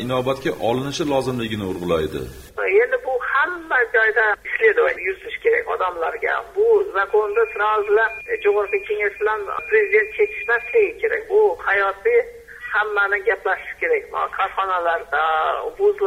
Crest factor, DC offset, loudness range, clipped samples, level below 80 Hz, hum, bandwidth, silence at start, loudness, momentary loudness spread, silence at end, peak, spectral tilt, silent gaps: 16 dB; under 0.1%; 2 LU; under 0.1%; -50 dBFS; none; 15.5 kHz; 0 s; -20 LUFS; 7 LU; 0 s; -4 dBFS; -5 dB/octave; none